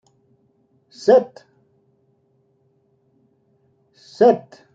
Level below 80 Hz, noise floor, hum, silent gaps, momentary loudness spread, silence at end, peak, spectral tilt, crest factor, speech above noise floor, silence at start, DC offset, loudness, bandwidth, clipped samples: -74 dBFS; -63 dBFS; none; none; 9 LU; 0.35 s; -2 dBFS; -6 dB/octave; 20 dB; 46 dB; 1.05 s; under 0.1%; -17 LUFS; 7.6 kHz; under 0.1%